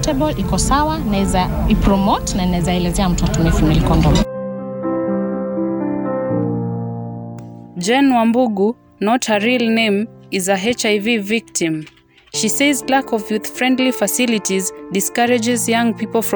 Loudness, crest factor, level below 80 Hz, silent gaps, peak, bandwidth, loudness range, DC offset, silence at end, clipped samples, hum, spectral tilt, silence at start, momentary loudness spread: -17 LUFS; 14 dB; -28 dBFS; none; -4 dBFS; over 20 kHz; 3 LU; under 0.1%; 0 s; under 0.1%; none; -4.5 dB/octave; 0 s; 8 LU